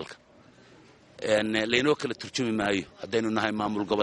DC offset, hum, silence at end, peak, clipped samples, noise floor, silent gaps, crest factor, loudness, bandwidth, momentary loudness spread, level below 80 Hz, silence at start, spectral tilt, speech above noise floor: under 0.1%; none; 0 s; -6 dBFS; under 0.1%; -56 dBFS; none; 22 dB; -27 LUFS; 11.5 kHz; 7 LU; -62 dBFS; 0 s; -4.5 dB/octave; 29 dB